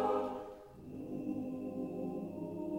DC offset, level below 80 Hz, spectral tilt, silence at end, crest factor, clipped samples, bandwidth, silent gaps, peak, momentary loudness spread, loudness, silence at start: under 0.1%; -68 dBFS; -8.5 dB/octave; 0 s; 18 dB; under 0.1%; 16.5 kHz; none; -22 dBFS; 12 LU; -41 LUFS; 0 s